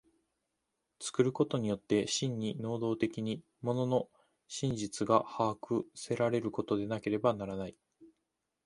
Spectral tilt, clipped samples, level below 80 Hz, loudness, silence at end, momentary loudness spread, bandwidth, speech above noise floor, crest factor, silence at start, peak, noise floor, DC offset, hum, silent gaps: -5.5 dB/octave; under 0.1%; -66 dBFS; -34 LUFS; 0.6 s; 9 LU; 11.5 kHz; 52 dB; 24 dB; 1 s; -12 dBFS; -85 dBFS; under 0.1%; none; none